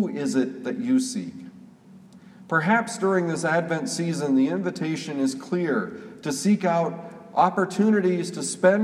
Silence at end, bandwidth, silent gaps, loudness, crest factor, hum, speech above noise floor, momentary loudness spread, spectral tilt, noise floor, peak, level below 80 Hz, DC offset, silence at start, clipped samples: 0 s; 14 kHz; none; -24 LUFS; 18 dB; none; 25 dB; 9 LU; -5.5 dB/octave; -49 dBFS; -6 dBFS; -74 dBFS; under 0.1%; 0 s; under 0.1%